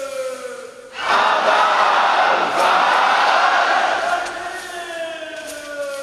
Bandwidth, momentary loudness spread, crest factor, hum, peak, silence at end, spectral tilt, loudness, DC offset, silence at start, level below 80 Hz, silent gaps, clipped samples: 13.5 kHz; 15 LU; 16 dB; none; -2 dBFS; 0 s; -1 dB/octave; -16 LUFS; under 0.1%; 0 s; -62 dBFS; none; under 0.1%